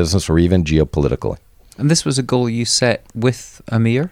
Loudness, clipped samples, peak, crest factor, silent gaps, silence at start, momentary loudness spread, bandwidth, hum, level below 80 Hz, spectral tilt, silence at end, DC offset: -17 LUFS; under 0.1%; -2 dBFS; 14 dB; none; 0 s; 8 LU; 15.5 kHz; none; -32 dBFS; -5 dB/octave; 0.05 s; under 0.1%